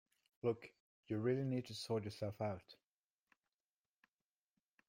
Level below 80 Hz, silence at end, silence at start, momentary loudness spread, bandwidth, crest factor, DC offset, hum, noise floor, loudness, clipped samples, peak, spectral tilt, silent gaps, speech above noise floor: -80 dBFS; 2.15 s; 0.45 s; 9 LU; 16 kHz; 20 dB; under 0.1%; none; under -90 dBFS; -43 LUFS; under 0.1%; -26 dBFS; -7 dB/octave; 0.80-1.03 s; over 48 dB